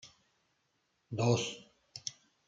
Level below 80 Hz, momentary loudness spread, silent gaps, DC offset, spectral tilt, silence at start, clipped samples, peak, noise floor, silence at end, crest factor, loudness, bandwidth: -74 dBFS; 18 LU; none; under 0.1%; -5 dB/octave; 0.05 s; under 0.1%; -18 dBFS; -78 dBFS; 0.35 s; 22 dB; -35 LUFS; 9.2 kHz